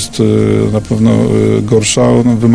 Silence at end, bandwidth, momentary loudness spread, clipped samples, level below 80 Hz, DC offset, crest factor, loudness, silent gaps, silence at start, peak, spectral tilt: 0 s; 11 kHz; 3 LU; 0.3%; -34 dBFS; under 0.1%; 10 dB; -10 LUFS; none; 0 s; 0 dBFS; -6 dB/octave